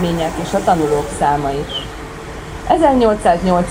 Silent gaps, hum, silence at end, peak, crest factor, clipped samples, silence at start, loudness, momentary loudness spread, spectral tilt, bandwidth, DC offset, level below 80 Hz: none; none; 0 s; 0 dBFS; 16 dB; under 0.1%; 0 s; -16 LUFS; 16 LU; -5.5 dB/octave; 16.5 kHz; under 0.1%; -32 dBFS